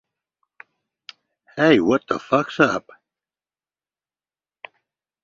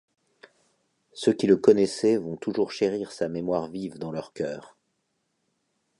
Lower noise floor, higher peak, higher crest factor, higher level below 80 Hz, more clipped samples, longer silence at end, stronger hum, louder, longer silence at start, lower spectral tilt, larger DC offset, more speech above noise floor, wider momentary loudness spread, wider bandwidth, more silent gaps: first, under -90 dBFS vs -76 dBFS; about the same, -2 dBFS vs -4 dBFS; about the same, 22 dB vs 22 dB; about the same, -62 dBFS vs -66 dBFS; neither; first, 2.45 s vs 1.4 s; neither; first, -19 LUFS vs -26 LUFS; first, 1.55 s vs 1.15 s; about the same, -6 dB/octave vs -6 dB/octave; neither; first, over 71 dB vs 51 dB; second, 10 LU vs 14 LU; second, 7.6 kHz vs 11 kHz; neither